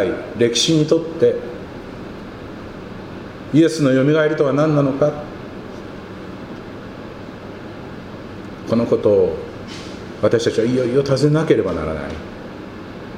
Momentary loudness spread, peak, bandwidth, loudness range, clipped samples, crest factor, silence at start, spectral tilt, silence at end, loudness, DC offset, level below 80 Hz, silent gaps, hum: 18 LU; -2 dBFS; 12.5 kHz; 9 LU; under 0.1%; 18 dB; 0 s; -5.5 dB/octave; 0 s; -17 LUFS; under 0.1%; -46 dBFS; none; none